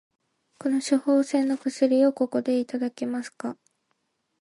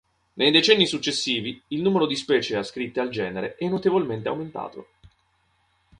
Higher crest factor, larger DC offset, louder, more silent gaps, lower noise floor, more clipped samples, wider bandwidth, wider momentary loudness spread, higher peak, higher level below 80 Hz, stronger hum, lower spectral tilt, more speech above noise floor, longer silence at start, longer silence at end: second, 16 dB vs 24 dB; neither; about the same, -25 LUFS vs -23 LUFS; neither; first, -75 dBFS vs -67 dBFS; neither; about the same, 11.5 kHz vs 10.5 kHz; about the same, 11 LU vs 13 LU; second, -10 dBFS vs -2 dBFS; second, -80 dBFS vs -62 dBFS; neither; about the same, -4.5 dB/octave vs -4 dB/octave; first, 51 dB vs 44 dB; first, 0.65 s vs 0.35 s; second, 0.85 s vs 1.15 s